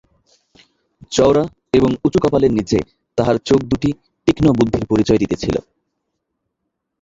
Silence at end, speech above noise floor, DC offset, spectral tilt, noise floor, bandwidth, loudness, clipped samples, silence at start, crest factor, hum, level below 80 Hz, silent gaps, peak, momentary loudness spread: 1.4 s; 61 dB; under 0.1%; -6.5 dB/octave; -76 dBFS; 8 kHz; -17 LUFS; under 0.1%; 1.1 s; 16 dB; none; -40 dBFS; none; -2 dBFS; 7 LU